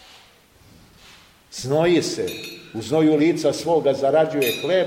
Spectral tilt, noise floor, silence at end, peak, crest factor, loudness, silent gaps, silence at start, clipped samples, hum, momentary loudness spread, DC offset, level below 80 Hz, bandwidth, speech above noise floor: -5 dB/octave; -52 dBFS; 0 s; -6 dBFS; 14 dB; -20 LUFS; none; 1.5 s; under 0.1%; none; 15 LU; under 0.1%; -58 dBFS; 16.5 kHz; 33 dB